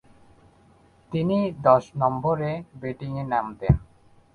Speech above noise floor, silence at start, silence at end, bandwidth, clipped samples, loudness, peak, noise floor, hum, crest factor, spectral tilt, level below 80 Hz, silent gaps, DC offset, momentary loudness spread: 33 dB; 1.1 s; 0.5 s; 7 kHz; under 0.1%; -24 LUFS; -4 dBFS; -57 dBFS; none; 22 dB; -9 dB/octave; -40 dBFS; none; under 0.1%; 12 LU